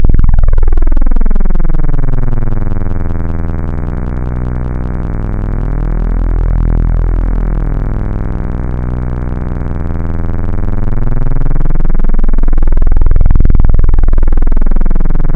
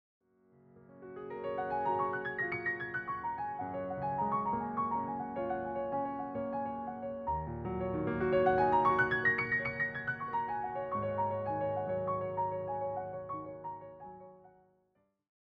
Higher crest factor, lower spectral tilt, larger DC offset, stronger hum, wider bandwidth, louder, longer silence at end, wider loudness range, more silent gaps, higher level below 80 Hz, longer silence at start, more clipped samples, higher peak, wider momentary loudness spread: second, 6 dB vs 18 dB; first, -10.5 dB/octave vs -8.5 dB/octave; neither; neither; second, 2.4 kHz vs 6 kHz; first, -16 LUFS vs -35 LUFS; second, 0 s vs 0.95 s; about the same, 4 LU vs 6 LU; neither; first, -8 dBFS vs -60 dBFS; second, 0 s vs 0.75 s; first, 4% vs under 0.1%; first, 0 dBFS vs -18 dBFS; second, 6 LU vs 13 LU